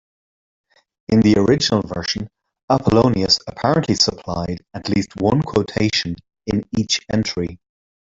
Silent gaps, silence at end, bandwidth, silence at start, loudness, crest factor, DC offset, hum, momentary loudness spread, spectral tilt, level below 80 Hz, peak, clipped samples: 2.63-2.68 s; 0.5 s; 7.8 kHz; 1.1 s; -19 LUFS; 18 dB; under 0.1%; none; 12 LU; -5 dB/octave; -46 dBFS; -2 dBFS; under 0.1%